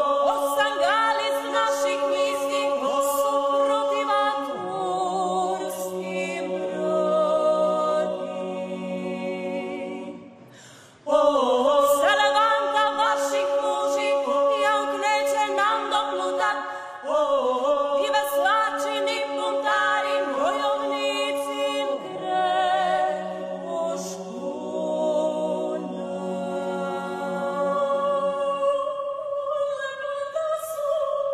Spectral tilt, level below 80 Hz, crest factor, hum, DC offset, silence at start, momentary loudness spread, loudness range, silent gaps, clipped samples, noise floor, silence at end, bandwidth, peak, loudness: -3.5 dB/octave; -68 dBFS; 16 dB; none; under 0.1%; 0 s; 9 LU; 6 LU; none; under 0.1%; -48 dBFS; 0 s; 15.5 kHz; -8 dBFS; -24 LUFS